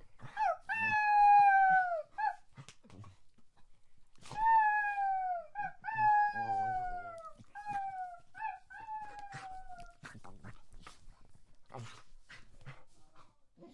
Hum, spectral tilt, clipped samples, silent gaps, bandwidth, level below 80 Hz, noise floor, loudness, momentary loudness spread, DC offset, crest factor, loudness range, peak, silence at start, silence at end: none; -4.5 dB/octave; under 0.1%; none; 11 kHz; -60 dBFS; -59 dBFS; -31 LUFS; 25 LU; under 0.1%; 16 dB; 22 LU; -18 dBFS; 0.05 s; 0.05 s